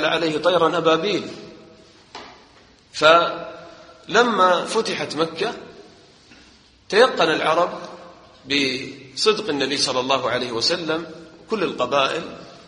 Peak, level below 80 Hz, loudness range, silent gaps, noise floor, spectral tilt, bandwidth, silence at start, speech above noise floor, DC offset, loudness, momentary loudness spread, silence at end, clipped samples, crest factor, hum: 0 dBFS; -62 dBFS; 3 LU; none; -51 dBFS; -3 dB/octave; 10 kHz; 0 s; 31 dB; under 0.1%; -20 LUFS; 20 LU; 0.1 s; under 0.1%; 22 dB; none